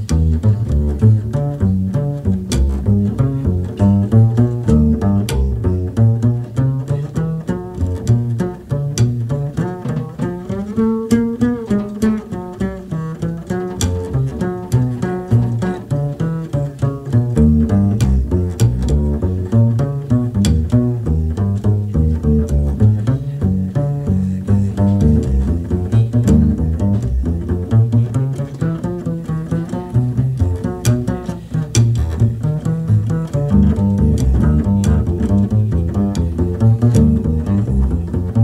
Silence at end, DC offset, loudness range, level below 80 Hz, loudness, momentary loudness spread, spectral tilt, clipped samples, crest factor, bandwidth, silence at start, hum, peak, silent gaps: 0 s; under 0.1%; 4 LU; -24 dBFS; -17 LUFS; 8 LU; -8 dB/octave; under 0.1%; 14 dB; 12.5 kHz; 0 s; none; 0 dBFS; none